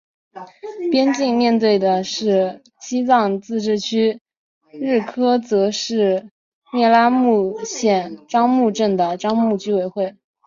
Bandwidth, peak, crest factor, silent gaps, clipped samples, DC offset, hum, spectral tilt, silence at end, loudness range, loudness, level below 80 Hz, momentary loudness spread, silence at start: 7.6 kHz; -2 dBFS; 16 dB; 4.21-4.25 s, 4.37-4.61 s, 6.31-6.62 s; under 0.1%; under 0.1%; none; -5 dB/octave; 0.35 s; 3 LU; -18 LUFS; -66 dBFS; 11 LU; 0.35 s